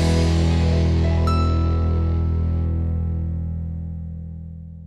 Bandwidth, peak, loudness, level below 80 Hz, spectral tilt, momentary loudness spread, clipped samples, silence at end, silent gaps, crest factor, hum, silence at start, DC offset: 9.8 kHz; -8 dBFS; -21 LUFS; -26 dBFS; -7.5 dB/octave; 14 LU; under 0.1%; 0 s; none; 12 dB; 50 Hz at -50 dBFS; 0 s; under 0.1%